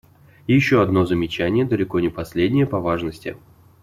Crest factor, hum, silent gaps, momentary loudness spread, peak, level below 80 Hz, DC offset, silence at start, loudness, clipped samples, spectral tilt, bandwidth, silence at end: 16 dB; none; none; 12 LU; -4 dBFS; -48 dBFS; under 0.1%; 0.5 s; -20 LUFS; under 0.1%; -7.5 dB/octave; 14.5 kHz; 0.5 s